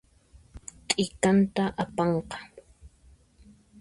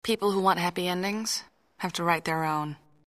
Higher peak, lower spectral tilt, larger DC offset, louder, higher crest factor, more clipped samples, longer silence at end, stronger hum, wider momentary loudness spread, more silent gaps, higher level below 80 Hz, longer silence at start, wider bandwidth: first, -6 dBFS vs -10 dBFS; about the same, -5 dB/octave vs -4 dB/octave; neither; about the same, -26 LUFS vs -28 LUFS; about the same, 24 dB vs 20 dB; neither; first, 0.95 s vs 0.35 s; neither; first, 22 LU vs 10 LU; neither; first, -54 dBFS vs -66 dBFS; first, 0.55 s vs 0.05 s; second, 11.5 kHz vs 15.5 kHz